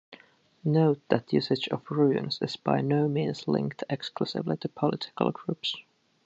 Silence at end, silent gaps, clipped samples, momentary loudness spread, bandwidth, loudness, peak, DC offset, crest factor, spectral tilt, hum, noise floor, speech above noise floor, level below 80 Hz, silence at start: 0.45 s; none; under 0.1%; 8 LU; 8 kHz; -28 LUFS; -6 dBFS; under 0.1%; 22 dB; -7.5 dB/octave; none; -56 dBFS; 29 dB; -70 dBFS; 0.1 s